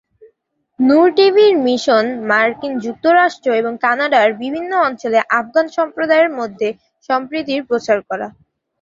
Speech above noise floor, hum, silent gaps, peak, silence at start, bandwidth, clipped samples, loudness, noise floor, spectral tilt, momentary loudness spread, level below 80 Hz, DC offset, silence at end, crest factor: 48 dB; none; none; -2 dBFS; 0.8 s; 7.8 kHz; under 0.1%; -15 LUFS; -63 dBFS; -4.5 dB/octave; 11 LU; -62 dBFS; under 0.1%; 0.5 s; 14 dB